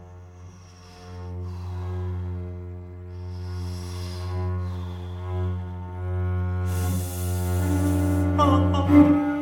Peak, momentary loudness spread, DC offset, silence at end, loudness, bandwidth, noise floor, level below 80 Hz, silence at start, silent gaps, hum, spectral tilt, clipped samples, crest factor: -4 dBFS; 20 LU; under 0.1%; 0 s; -25 LUFS; 18 kHz; -46 dBFS; -42 dBFS; 0 s; none; none; -7.5 dB/octave; under 0.1%; 20 dB